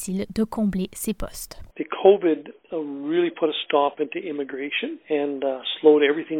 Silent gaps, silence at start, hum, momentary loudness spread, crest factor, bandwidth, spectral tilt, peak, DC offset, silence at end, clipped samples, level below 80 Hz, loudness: none; 0 s; none; 14 LU; 20 dB; 17.5 kHz; -5 dB/octave; -2 dBFS; under 0.1%; 0 s; under 0.1%; -48 dBFS; -23 LUFS